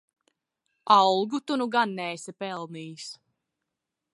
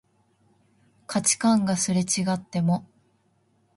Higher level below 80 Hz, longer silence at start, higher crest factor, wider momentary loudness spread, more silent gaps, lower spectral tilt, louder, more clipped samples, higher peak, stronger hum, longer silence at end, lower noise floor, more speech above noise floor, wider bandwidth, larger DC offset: second, -82 dBFS vs -64 dBFS; second, 0.85 s vs 1.1 s; about the same, 22 dB vs 18 dB; first, 20 LU vs 6 LU; neither; about the same, -4 dB/octave vs -4.5 dB/octave; about the same, -25 LUFS vs -24 LUFS; neither; about the same, -6 dBFS vs -8 dBFS; neither; about the same, 1 s vs 0.95 s; first, -85 dBFS vs -66 dBFS; first, 60 dB vs 43 dB; about the same, 11.5 kHz vs 11.5 kHz; neither